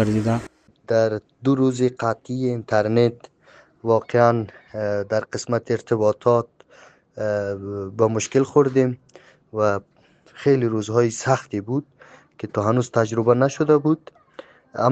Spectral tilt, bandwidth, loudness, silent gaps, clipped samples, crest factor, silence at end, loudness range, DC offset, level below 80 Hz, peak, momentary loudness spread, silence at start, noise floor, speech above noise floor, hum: -6.5 dB/octave; 9 kHz; -21 LUFS; none; under 0.1%; 20 dB; 0 s; 2 LU; under 0.1%; -60 dBFS; -2 dBFS; 10 LU; 0 s; -53 dBFS; 32 dB; none